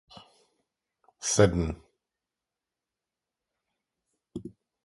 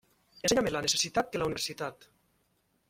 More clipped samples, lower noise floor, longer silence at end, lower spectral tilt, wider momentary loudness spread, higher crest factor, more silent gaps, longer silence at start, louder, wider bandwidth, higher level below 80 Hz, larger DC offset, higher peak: neither; first, -89 dBFS vs -74 dBFS; second, 0.35 s vs 0.85 s; first, -4.5 dB/octave vs -2.5 dB/octave; first, 21 LU vs 9 LU; about the same, 26 dB vs 22 dB; neither; first, 1.2 s vs 0.45 s; first, -26 LUFS vs -30 LUFS; second, 11.5 kHz vs 16.5 kHz; first, -48 dBFS vs -58 dBFS; neither; first, -8 dBFS vs -12 dBFS